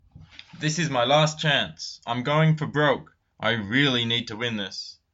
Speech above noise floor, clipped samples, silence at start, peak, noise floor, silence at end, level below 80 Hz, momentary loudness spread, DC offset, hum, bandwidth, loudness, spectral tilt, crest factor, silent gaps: 24 dB; under 0.1%; 0.15 s; -8 dBFS; -48 dBFS; 0.2 s; -62 dBFS; 10 LU; under 0.1%; none; 8 kHz; -24 LUFS; -4.5 dB/octave; 18 dB; none